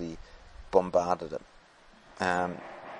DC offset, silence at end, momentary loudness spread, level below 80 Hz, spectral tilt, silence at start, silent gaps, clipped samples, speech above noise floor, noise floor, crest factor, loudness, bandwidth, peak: under 0.1%; 0 s; 16 LU; -56 dBFS; -5.5 dB/octave; 0 s; none; under 0.1%; 28 dB; -57 dBFS; 24 dB; -30 LUFS; 10.5 kHz; -8 dBFS